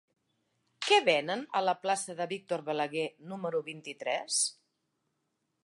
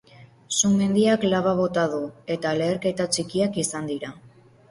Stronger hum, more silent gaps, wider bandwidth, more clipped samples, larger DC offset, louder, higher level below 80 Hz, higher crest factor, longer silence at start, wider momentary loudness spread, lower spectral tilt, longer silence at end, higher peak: neither; neither; about the same, 11.5 kHz vs 11.5 kHz; neither; neither; second, -31 LUFS vs -23 LUFS; second, -88 dBFS vs -58 dBFS; first, 22 dB vs 16 dB; first, 0.8 s vs 0.2 s; about the same, 12 LU vs 11 LU; second, -2 dB/octave vs -4.5 dB/octave; first, 1.1 s vs 0.4 s; second, -12 dBFS vs -8 dBFS